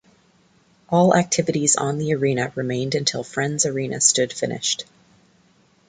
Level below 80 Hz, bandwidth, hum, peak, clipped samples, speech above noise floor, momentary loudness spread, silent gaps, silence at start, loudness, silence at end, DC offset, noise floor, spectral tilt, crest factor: -60 dBFS; 9.6 kHz; none; -2 dBFS; under 0.1%; 37 dB; 8 LU; none; 0.9 s; -20 LUFS; 1.05 s; under 0.1%; -58 dBFS; -3.5 dB/octave; 20 dB